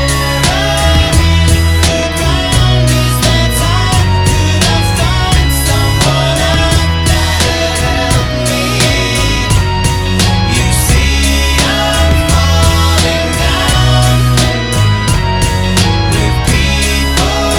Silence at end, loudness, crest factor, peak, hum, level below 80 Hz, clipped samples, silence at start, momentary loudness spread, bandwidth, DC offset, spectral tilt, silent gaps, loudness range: 0 s; -10 LUFS; 10 dB; 0 dBFS; none; -16 dBFS; under 0.1%; 0 s; 3 LU; 18.5 kHz; under 0.1%; -4 dB/octave; none; 1 LU